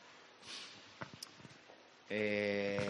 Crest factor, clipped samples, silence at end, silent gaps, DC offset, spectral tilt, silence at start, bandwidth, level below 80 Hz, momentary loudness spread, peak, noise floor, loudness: 18 dB; under 0.1%; 0 s; none; under 0.1%; -4.5 dB/octave; 0 s; 11 kHz; -80 dBFS; 23 LU; -24 dBFS; -61 dBFS; -41 LUFS